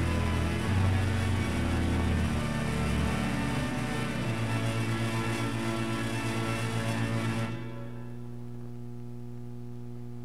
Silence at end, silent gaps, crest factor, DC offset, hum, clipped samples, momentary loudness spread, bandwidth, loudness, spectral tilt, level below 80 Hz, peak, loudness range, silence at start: 0 s; none; 16 dB; 0.8%; 60 Hz at -40 dBFS; under 0.1%; 14 LU; 15 kHz; -30 LUFS; -6 dB/octave; -44 dBFS; -14 dBFS; 6 LU; 0 s